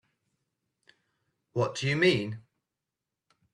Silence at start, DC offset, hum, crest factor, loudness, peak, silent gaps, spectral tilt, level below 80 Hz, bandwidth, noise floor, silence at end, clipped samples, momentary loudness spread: 1.55 s; under 0.1%; none; 22 dB; -28 LUFS; -12 dBFS; none; -5.5 dB/octave; -68 dBFS; 11.5 kHz; -88 dBFS; 1.15 s; under 0.1%; 14 LU